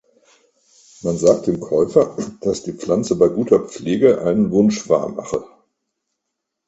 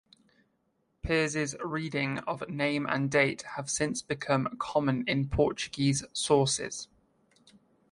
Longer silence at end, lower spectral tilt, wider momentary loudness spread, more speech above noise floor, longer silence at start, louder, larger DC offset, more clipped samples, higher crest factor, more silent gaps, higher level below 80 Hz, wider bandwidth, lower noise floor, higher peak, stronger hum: first, 1.2 s vs 1.05 s; first, -6.5 dB/octave vs -4.5 dB/octave; about the same, 10 LU vs 9 LU; first, 61 dB vs 45 dB; about the same, 1.05 s vs 1.05 s; first, -18 LUFS vs -29 LUFS; neither; neither; about the same, 18 dB vs 20 dB; neither; about the same, -52 dBFS vs -50 dBFS; second, 8.2 kHz vs 11.5 kHz; first, -79 dBFS vs -75 dBFS; first, 0 dBFS vs -10 dBFS; neither